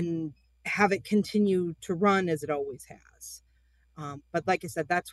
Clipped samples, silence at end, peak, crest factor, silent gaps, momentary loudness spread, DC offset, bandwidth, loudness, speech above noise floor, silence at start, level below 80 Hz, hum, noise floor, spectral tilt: under 0.1%; 0 s; -8 dBFS; 20 dB; none; 19 LU; under 0.1%; 12.5 kHz; -28 LUFS; 36 dB; 0 s; -64 dBFS; none; -65 dBFS; -6 dB/octave